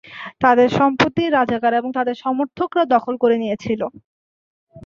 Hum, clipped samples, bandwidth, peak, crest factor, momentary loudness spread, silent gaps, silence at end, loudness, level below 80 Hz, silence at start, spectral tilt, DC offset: none; under 0.1%; 7.4 kHz; -2 dBFS; 18 dB; 9 LU; 4.04-4.67 s; 0.05 s; -18 LUFS; -56 dBFS; 0.05 s; -6.5 dB/octave; under 0.1%